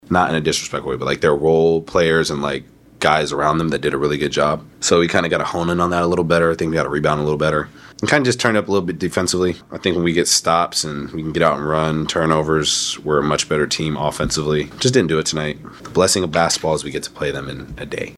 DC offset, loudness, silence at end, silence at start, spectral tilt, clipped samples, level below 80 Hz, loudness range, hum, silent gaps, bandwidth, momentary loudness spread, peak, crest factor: under 0.1%; -18 LUFS; 0 s; 0.1 s; -4 dB/octave; under 0.1%; -42 dBFS; 1 LU; none; none; 14 kHz; 9 LU; 0 dBFS; 18 dB